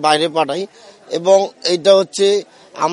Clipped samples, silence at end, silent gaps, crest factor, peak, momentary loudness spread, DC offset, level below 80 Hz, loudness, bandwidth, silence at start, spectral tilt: under 0.1%; 0 s; none; 16 dB; 0 dBFS; 13 LU; under 0.1%; -66 dBFS; -15 LUFS; 11.5 kHz; 0 s; -3.5 dB/octave